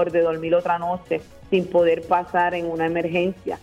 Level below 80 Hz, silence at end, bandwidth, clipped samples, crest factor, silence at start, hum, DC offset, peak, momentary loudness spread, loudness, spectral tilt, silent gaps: -54 dBFS; 0.05 s; 8.6 kHz; under 0.1%; 16 dB; 0 s; none; under 0.1%; -6 dBFS; 7 LU; -22 LUFS; -7 dB/octave; none